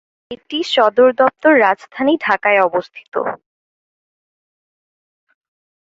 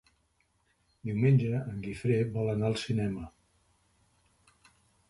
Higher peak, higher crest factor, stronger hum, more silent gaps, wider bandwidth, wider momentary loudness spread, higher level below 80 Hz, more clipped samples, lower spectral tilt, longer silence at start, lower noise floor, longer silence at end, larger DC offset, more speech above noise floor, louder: first, -2 dBFS vs -16 dBFS; about the same, 16 dB vs 18 dB; neither; first, 3.08-3.12 s vs none; second, 7.8 kHz vs 11.5 kHz; about the same, 14 LU vs 14 LU; second, -64 dBFS vs -58 dBFS; neither; second, -4.5 dB/octave vs -7.5 dB/octave; second, 0.3 s vs 1.05 s; first, under -90 dBFS vs -73 dBFS; first, 2.6 s vs 1.8 s; neither; first, over 75 dB vs 44 dB; first, -15 LUFS vs -30 LUFS